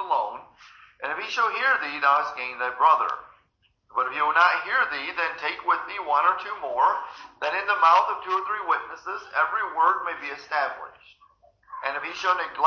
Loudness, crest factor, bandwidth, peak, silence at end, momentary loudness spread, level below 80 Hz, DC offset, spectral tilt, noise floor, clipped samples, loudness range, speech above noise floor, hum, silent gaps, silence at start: -24 LUFS; 20 dB; 7 kHz; -6 dBFS; 0 s; 13 LU; -70 dBFS; under 0.1%; -1.5 dB/octave; -67 dBFS; under 0.1%; 4 LU; 43 dB; none; none; 0 s